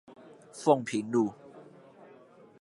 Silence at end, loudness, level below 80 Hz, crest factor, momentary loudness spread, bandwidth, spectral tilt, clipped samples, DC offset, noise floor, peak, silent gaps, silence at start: 1 s; -29 LUFS; -78 dBFS; 24 dB; 24 LU; 11.5 kHz; -6 dB/octave; under 0.1%; under 0.1%; -56 dBFS; -8 dBFS; none; 0.1 s